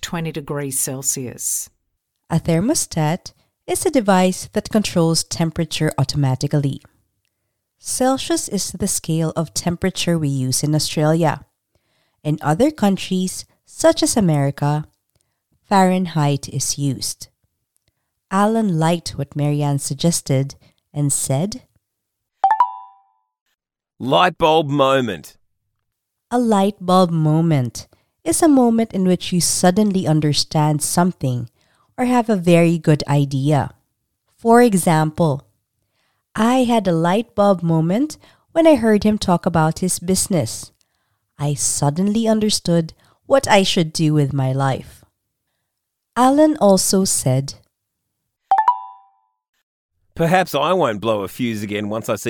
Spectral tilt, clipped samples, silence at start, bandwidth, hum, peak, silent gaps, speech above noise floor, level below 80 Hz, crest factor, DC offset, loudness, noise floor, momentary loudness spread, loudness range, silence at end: -5 dB/octave; under 0.1%; 0 s; 19 kHz; none; 0 dBFS; 23.41-23.46 s, 49.49-49.53 s, 49.63-49.89 s; 60 dB; -50 dBFS; 18 dB; under 0.1%; -18 LUFS; -77 dBFS; 11 LU; 5 LU; 0 s